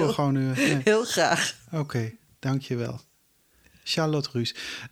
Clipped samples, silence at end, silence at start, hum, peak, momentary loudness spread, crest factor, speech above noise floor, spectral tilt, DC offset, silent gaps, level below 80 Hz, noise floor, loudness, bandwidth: under 0.1%; 0.05 s; 0 s; none; -8 dBFS; 13 LU; 18 dB; 39 dB; -4.5 dB/octave; under 0.1%; none; -66 dBFS; -65 dBFS; -26 LUFS; 16.5 kHz